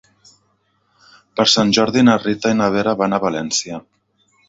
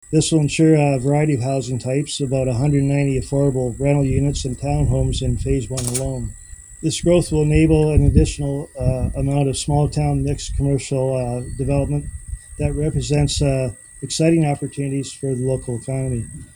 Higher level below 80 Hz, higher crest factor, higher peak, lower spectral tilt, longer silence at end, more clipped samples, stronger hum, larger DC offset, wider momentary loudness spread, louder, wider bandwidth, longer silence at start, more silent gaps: second, -54 dBFS vs -30 dBFS; about the same, 18 dB vs 18 dB; about the same, 0 dBFS vs 0 dBFS; second, -4 dB/octave vs -6 dB/octave; first, 0.7 s vs 0.1 s; neither; neither; neither; about the same, 10 LU vs 10 LU; first, -16 LUFS vs -19 LUFS; second, 7.8 kHz vs 19.5 kHz; first, 1.35 s vs 0.1 s; neither